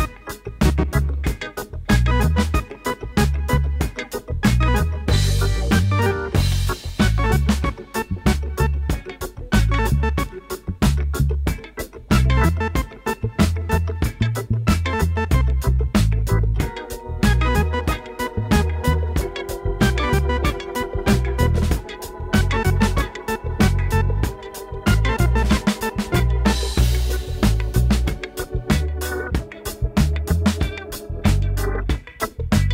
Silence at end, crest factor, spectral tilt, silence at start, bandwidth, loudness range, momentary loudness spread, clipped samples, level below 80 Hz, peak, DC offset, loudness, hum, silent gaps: 0 s; 14 dB; -6 dB/octave; 0 s; 16.5 kHz; 2 LU; 9 LU; under 0.1%; -24 dBFS; -6 dBFS; under 0.1%; -21 LUFS; none; none